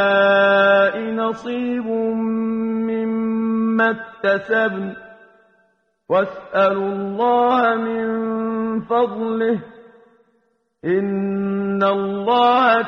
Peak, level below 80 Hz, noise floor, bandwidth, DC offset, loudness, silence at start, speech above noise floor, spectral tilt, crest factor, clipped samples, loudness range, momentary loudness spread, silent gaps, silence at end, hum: -4 dBFS; -62 dBFS; -65 dBFS; 6.4 kHz; under 0.1%; -19 LUFS; 0 s; 46 dB; -7.5 dB/octave; 16 dB; under 0.1%; 4 LU; 9 LU; none; 0 s; none